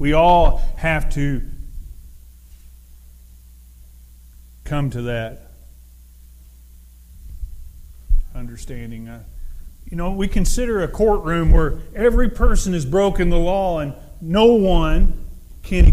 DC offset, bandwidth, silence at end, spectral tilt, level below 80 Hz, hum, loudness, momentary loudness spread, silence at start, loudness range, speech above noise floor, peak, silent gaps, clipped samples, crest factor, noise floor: under 0.1%; 13.5 kHz; 0 s; -6 dB/octave; -22 dBFS; none; -19 LUFS; 24 LU; 0 s; 15 LU; 28 dB; -2 dBFS; none; under 0.1%; 16 dB; -44 dBFS